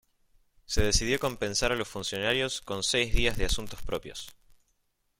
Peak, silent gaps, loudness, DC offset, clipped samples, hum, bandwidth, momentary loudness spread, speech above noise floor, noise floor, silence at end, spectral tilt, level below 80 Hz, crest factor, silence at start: -10 dBFS; none; -29 LUFS; under 0.1%; under 0.1%; none; 16.5 kHz; 10 LU; 46 dB; -74 dBFS; 0.9 s; -3 dB/octave; -38 dBFS; 20 dB; 0.7 s